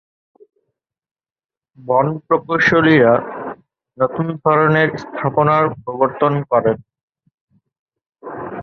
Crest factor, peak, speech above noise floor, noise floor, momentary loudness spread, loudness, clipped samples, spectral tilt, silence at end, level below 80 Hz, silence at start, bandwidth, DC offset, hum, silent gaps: 18 dB; 0 dBFS; 60 dB; -75 dBFS; 16 LU; -16 LUFS; under 0.1%; -7.5 dB/octave; 0 s; -56 dBFS; 1.8 s; 6.6 kHz; under 0.1%; none; 7.03-7.08 s, 7.34-7.48 s, 7.79-7.86 s